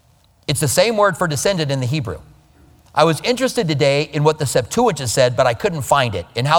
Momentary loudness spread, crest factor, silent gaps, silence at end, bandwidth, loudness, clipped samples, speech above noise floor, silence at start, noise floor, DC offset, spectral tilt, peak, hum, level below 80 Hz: 7 LU; 18 dB; none; 0 s; 19.5 kHz; -17 LUFS; under 0.1%; 32 dB; 0.5 s; -49 dBFS; under 0.1%; -4.5 dB/octave; 0 dBFS; none; -46 dBFS